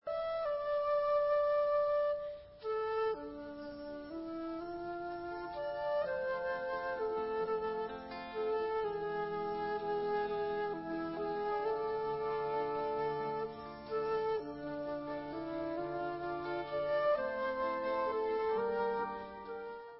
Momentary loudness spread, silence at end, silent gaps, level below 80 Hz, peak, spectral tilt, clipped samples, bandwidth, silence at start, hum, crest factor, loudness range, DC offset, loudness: 10 LU; 0 s; none; -66 dBFS; -24 dBFS; -3.5 dB/octave; under 0.1%; 5.6 kHz; 0.05 s; none; 14 dB; 5 LU; under 0.1%; -37 LUFS